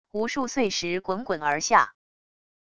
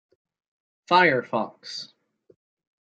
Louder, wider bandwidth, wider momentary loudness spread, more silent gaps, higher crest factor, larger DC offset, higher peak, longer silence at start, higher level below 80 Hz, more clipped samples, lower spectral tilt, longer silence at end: second, -25 LUFS vs -22 LUFS; first, 11 kHz vs 9 kHz; second, 8 LU vs 18 LU; neither; about the same, 22 dB vs 22 dB; neither; about the same, -4 dBFS vs -4 dBFS; second, 0.05 s vs 0.9 s; first, -60 dBFS vs -76 dBFS; neither; second, -3 dB/octave vs -5 dB/octave; second, 0.7 s vs 0.95 s